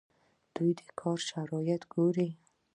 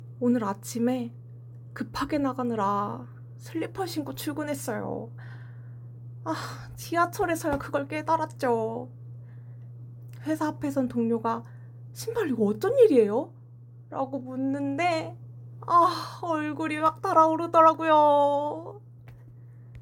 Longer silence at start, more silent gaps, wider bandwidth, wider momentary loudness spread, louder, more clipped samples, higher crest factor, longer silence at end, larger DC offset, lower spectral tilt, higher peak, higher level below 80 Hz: first, 0.55 s vs 0 s; neither; second, 10.5 kHz vs 17 kHz; second, 7 LU vs 23 LU; second, -33 LUFS vs -26 LUFS; neither; about the same, 16 dB vs 20 dB; first, 0.4 s vs 0 s; neither; about the same, -6.5 dB/octave vs -6 dB/octave; second, -18 dBFS vs -6 dBFS; second, -78 dBFS vs -60 dBFS